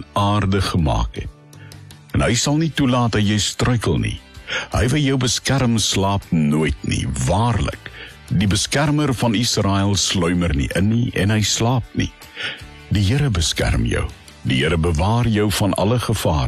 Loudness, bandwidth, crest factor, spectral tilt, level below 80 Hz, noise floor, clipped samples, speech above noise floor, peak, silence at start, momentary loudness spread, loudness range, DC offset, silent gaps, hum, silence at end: -19 LUFS; 13.5 kHz; 12 dB; -5 dB/octave; -30 dBFS; -40 dBFS; under 0.1%; 22 dB; -6 dBFS; 0 s; 9 LU; 2 LU; under 0.1%; none; none; 0 s